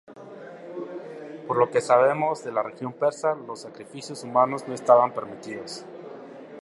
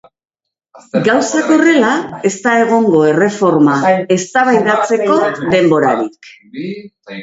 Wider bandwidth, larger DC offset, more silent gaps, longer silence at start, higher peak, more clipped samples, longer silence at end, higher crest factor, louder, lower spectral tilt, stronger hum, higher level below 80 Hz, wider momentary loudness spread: first, 11.5 kHz vs 8 kHz; neither; neither; second, 0.1 s vs 0.75 s; second, -4 dBFS vs 0 dBFS; neither; about the same, 0 s vs 0 s; first, 22 dB vs 12 dB; second, -24 LUFS vs -12 LUFS; about the same, -5 dB/octave vs -5 dB/octave; neither; second, -76 dBFS vs -56 dBFS; first, 22 LU vs 14 LU